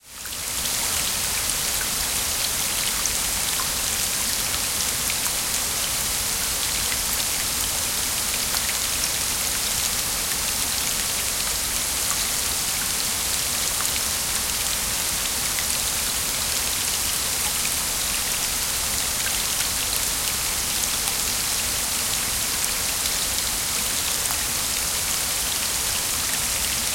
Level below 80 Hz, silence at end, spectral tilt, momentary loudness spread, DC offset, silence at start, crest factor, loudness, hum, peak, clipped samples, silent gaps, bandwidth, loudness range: -42 dBFS; 0 s; 0 dB/octave; 1 LU; under 0.1%; 0.05 s; 22 dB; -21 LUFS; none; -2 dBFS; under 0.1%; none; 17 kHz; 0 LU